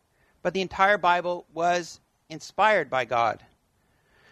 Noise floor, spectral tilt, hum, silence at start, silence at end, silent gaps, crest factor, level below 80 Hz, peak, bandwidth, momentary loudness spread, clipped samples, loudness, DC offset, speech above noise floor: -67 dBFS; -4 dB/octave; none; 0.45 s; 0.95 s; none; 22 dB; -62 dBFS; -6 dBFS; 12.5 kHz; 18 LU; under 0.1%; -24 LUFS; under 0.1%; 43 dB